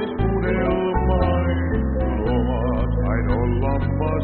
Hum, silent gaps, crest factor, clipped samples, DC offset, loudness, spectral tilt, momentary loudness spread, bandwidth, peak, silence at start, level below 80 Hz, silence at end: none; none; 12 dB; under 0.1%; under 0.1%; -21 LUFS; -7.5 dB/octave; 3 LU; 4.3 kHz; -8 dBFS; 0 s; -24 dBFS; 0 s